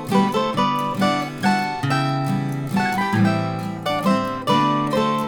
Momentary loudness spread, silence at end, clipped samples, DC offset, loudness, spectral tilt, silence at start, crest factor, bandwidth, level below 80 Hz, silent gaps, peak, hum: 5 LU; 0 s; under 0.1%; under 0.1%; -21 LUFS; -6 dB/octave; 0 s; 16 dB; 19.5 kHz; -52 dBFS; none; -6 dBFS; none